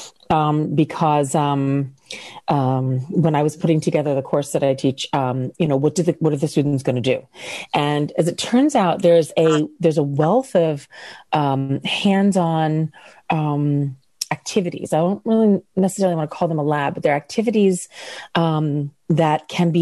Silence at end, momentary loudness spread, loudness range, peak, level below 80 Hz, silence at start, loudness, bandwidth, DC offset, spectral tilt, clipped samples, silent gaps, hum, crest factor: 0 s; 8 LU; 3 LU; -4 dBFS; -58 dBFS; 0 s; -19 LUFS; 12.5 kHz; under 0.1%; -6.5 dB/octave; under 0.1%; none; none; 14 dB